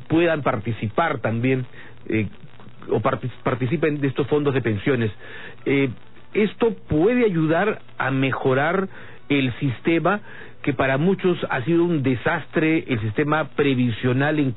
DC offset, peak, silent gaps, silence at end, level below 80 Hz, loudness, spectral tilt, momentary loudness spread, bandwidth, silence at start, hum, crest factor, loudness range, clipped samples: 1%; -8 dBFS; none; 0 s; -52 dBFS; -22 LUFS; -11.5 dB/octave; 7 LU; 4.1 kHz; 0 s; none; 14 dB; 3 LU; under 0.1%